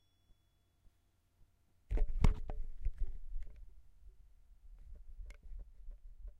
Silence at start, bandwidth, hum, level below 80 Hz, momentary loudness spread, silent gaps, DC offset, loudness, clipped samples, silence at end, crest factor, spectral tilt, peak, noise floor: 1.9 s; 6 kHz; none; -40 dBFS; 26 LU; none; under 0.1%; -42 LUFS; under 0.1%; 0.05 s; 26 dB; -7.5 dB/octave; -14 dBFS; -75 dBFS